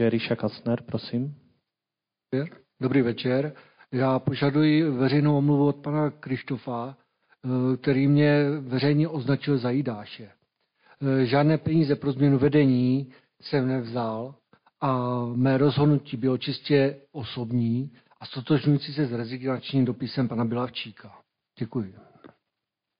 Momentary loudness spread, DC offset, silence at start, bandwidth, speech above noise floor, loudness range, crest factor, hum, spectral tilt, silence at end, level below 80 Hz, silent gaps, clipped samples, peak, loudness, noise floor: 14 LU; under 0.1%; 0 s; 5.2 kHz; 64 dB; 5 LU; 16 dB; none; -6.5 dB/octave; 0.75 s; -64 dBFS; none; under 0.1%; -10 dBFS; -25 LUFS; -88 dBFS